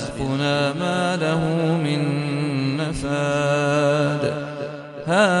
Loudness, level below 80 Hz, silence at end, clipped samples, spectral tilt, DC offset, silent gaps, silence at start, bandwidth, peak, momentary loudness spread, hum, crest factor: -21 LUFS; -46 dBFS; 0 s; under 0.1%; -6 dB/octave; under 0.1%; none; 0 s; 11.5 kHz; -4 dBFS; 7 LU; none; 18 dB